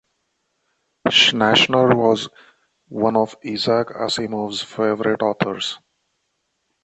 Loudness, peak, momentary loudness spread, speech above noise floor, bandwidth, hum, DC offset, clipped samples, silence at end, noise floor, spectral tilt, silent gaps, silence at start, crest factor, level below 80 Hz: -18 LUFS; -2 dBFS; 12 LU; 53 dB; 8.8 kHz; none; under 0.1%; under 0.1%; 1.05 s; -72 dBFS; -4 dB/octave; none; 1.05 s; 18 dB; -60 dBFS